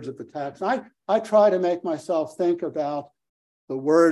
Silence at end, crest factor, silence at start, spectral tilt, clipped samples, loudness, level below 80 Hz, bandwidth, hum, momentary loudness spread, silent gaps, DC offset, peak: 0 s; 18 dB; 0 s; -6.5 dB/octave; under 0.1%; -24 LUFS; -74 dBFS; 12 kHz; none; 15 LU; 3.29-3.68 s; under 0.1%; -6 dBFS